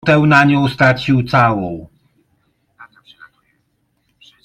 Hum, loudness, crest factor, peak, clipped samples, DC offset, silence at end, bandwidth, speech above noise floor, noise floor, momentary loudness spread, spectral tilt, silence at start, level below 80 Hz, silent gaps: none; -13 LUFS; 16 dB; 0 dBFS; under 0.1%; under 0.1%; 1.6 s; 11.5 kHz; 52 dB; -65 dBFS; 13 LU; -7 dB/octave; 0.05 s; -48 dBFS; none